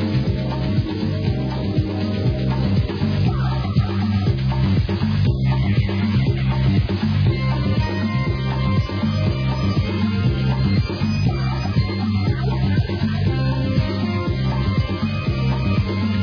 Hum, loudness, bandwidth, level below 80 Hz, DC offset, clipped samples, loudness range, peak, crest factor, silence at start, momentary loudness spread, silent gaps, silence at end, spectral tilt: none; -20 LUFS; 5.4 kHz; -30 dBFS; under 0.1%; under 0.1%; 2 LU; -6 dBFS; 12 dB; 0 s; 3 LU; none; 0 s; -8.5 dB/octave